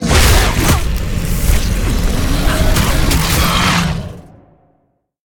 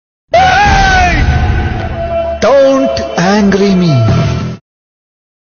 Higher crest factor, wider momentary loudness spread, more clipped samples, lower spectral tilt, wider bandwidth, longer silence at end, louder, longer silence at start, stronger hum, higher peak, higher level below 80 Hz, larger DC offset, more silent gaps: about the same, 14 dB vs 10 dB; about the same, 8 LU vs 9 LU; neither; second, -4 dB/octave vs -6 dB/octave; first, 18.5 kHz vs 7 kHz; about the same, 1.05 s vs 1 s; second, -14 LUFS vs -10 LUFS; second, 0 s vs 0.3 s; neither; about the same, 0 dBFS vs 0 dBFS; about the same, -16 dBFS vs -20 dBFS; neither; neither